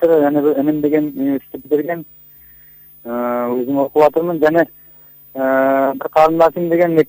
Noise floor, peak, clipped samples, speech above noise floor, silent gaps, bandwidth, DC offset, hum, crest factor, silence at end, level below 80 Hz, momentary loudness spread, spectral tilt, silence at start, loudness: -43 dBFS; -2 dBFS; under 0.1%; 28 dB; none; 16 kHz; under 0.1%; none; 14 dB; 0.05 s; -56 dBFS; 10 LU; -8 dB/octave; 0 s; -16 LUFS